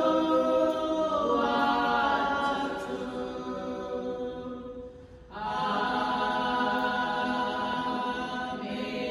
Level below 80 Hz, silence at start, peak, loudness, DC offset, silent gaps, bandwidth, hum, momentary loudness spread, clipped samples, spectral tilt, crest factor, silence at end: -56 dBFS; 0 s; -14 dBFS; -29 LUFS; under 0.1%; none; 12.5 kHz; none; 11 LU; under 0.1%; -5 dB/octave; 16 dB; 0 s